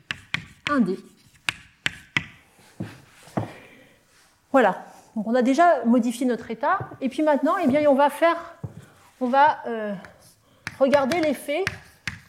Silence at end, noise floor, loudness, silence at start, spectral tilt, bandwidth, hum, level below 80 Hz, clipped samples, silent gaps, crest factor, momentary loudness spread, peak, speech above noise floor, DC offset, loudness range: 0.1 s; -59 dBFS; -23 LUFS; 0.1 s; -5 dB/octave; 15.5 kHz; none; -60 dBFS; under 0.1%; none; 22 dB; 19 LU; -2 dBFS; 38 dB; under 0.1%; 8 LU